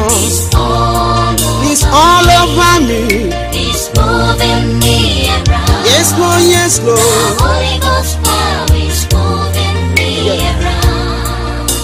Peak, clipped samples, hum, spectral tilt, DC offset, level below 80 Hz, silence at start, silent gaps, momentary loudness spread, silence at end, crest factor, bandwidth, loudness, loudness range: 0 dBFS; 0.2%; none; -4 dB/octave; under 0.1%; -18 dBFS; 0 s; none; 6 LU; 0 s; 10 dB; 16 kHz; -10 LUFS; 3 LU